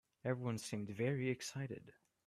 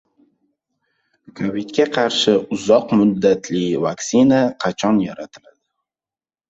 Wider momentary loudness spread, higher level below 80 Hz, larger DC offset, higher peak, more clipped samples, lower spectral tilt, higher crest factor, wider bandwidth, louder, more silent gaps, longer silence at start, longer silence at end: about the same, 9 LU vs 10 LU; second, -78 dBFS vs -58 dBFS; neither; second, -26 dBFS vs -2 dBFS; neither; about the same, -5.5 dB/octave vs -5 dB/octave; about the same, 18 dB vs 16 dB; first, 14 kHz vs 8 kHz; second, -42 LUFS vs -17 LUFS; neither; second, 0.25 s vs 1.35 s; second, 0.35 s vs 1.15 s